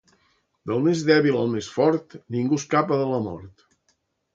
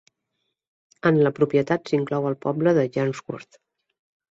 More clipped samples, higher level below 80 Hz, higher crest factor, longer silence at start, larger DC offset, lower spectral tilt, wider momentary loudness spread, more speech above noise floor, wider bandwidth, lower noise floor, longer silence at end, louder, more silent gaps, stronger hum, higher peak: neither; about the same, -60 dBFS vs -64 dBFS; about the same, 20 dB vs 18 dB; second, 0.65 s vs 1.05 s; neither; second, -6 dB/octave vs -8 dB/octave; first, 13 LU vs 10 LU; second, 48 dB vs 56 dB; about the same, 7.8 kHz vs 7.8 kHz; second, -70 dBFS vs -78 dBFS; about the same, 0.85 s vs 0.9 s; about the same, -23 LUFS vs -22 LUFS; neither; neither; about the same, -4 dBFS vs -6 dBFS